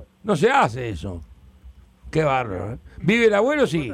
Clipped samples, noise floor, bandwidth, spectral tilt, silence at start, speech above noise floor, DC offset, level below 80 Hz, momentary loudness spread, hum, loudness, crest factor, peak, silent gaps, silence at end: under 0.1%; -47 dBFS; 14 kHz; -6 dB/octave; 0 s; 27 dB; under 0.1%; -46 dBFS; 15 LU; none; -21 LUFS; 16 dB; -6 dBFS; none; 0 s